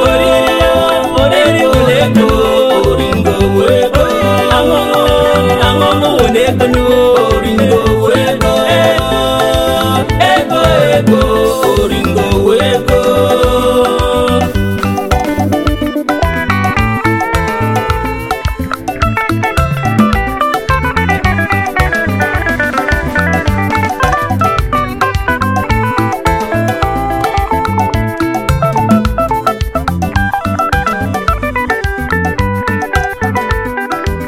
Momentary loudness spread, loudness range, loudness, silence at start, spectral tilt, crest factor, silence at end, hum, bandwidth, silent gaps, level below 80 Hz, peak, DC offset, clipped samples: 6 LU; 4 LU; -11 LUFS; 0 s; -5.5 dB/octave; 10 dB; 0 s; none; 17 kHz; none; -22 dBFS; 0 dBFS; under 0.1%; under 0.1%